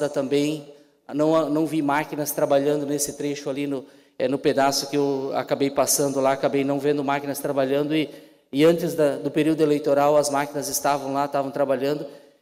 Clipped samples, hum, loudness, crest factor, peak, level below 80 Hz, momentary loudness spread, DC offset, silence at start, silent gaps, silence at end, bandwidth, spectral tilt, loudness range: under 0.1%; none; -23 LUFS; 14 dB; -8 dBFS; -66 dBFS; 8 LU; under 0.1%; 0 s; none; 0.25 s; 16 kHz; -4.5 dB/octave; 2 LU